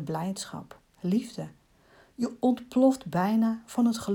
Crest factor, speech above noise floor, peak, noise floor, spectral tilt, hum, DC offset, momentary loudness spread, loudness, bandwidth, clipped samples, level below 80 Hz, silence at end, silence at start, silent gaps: 18 dB; 32 dB; -12 dBFS; -59 dBFS; -6.5 dB/octave; none; under 0.1%; 15 LU; -28 LUFS; 17.5 kHz; under 0.1%; -66 dBFS; 0 s; 0 s; none